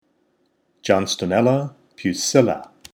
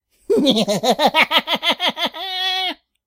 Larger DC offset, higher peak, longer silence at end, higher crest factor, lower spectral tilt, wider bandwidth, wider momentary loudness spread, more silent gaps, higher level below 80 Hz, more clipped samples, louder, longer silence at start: neither; about the same, -2 dBFS vs 0 dBFS; about the same, 0.3 s vs 0.3 s; about the same, 20 dB vs 18 dB; first, -4.5 dB/octave vs -3 dB/octave; first, over 20 kHz vs 16 kHz; first, 13 LU vs 7 LU; neither; about the same, -62 dBFS vs -62 dBFS; neither; second, -20 LUFS vs -17 LUFS; first, 0.85 s vs 0.3 s